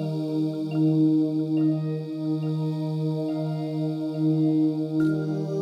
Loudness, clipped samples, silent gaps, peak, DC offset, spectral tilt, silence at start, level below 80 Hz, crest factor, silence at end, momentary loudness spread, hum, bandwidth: -25 LUFS; under 0.1%; none; -12 dBFS; under 0.1%; -9.5 dB/octave; 0 s; -74 dBFS; 12 dB; 0 s; 6 LU; none; 5.8 kHz